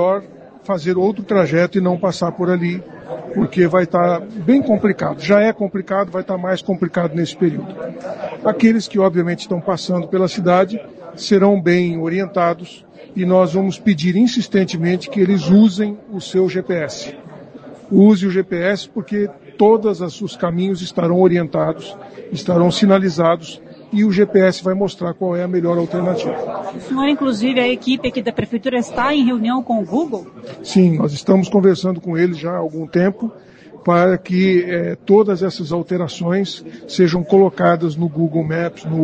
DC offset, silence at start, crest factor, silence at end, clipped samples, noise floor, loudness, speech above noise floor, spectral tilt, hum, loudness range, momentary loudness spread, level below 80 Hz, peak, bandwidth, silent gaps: under 0.1%; 0 s; 16 dB; 0 s; under 0.1%; -37 dBFS; -17 LUFS; 21 dB; -7 dB/octave; none; 2 LU; 12 LU; -54 dBFS; 0 dBFS; 8.8 kHz; none